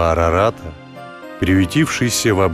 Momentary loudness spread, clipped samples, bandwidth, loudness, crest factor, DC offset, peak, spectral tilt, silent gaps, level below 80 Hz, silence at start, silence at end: 19 LU; under 0.1%; 14.5 kHz; -16 LUFS; 12 dB; under 0.1%; -4 dBFS; -5 dB/octave; none; -38 dBFS; 0 s; 0 s